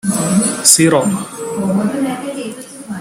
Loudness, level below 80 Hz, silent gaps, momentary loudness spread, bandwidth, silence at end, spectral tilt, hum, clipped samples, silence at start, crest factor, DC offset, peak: -14 LUFS; -54 dBFS; none; 18 LU; 16.5 kHz; 0 s; -3.5 dB/octave; none; 0.1%; 0.05 s; 16 dB; under 0.1%; 0 dBFS